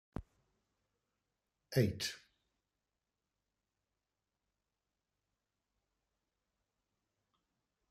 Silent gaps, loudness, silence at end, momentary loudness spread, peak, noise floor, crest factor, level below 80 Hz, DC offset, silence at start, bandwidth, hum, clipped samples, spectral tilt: none; -37 LUFS; 5.75 s; 17 LU; -18 dBFS; under -90 dBFS; 28 dB; -68 dBFS; under 0.1%; 0.2 s; 13.5 kHz; none; under 0.1%; -5.5 dB/octave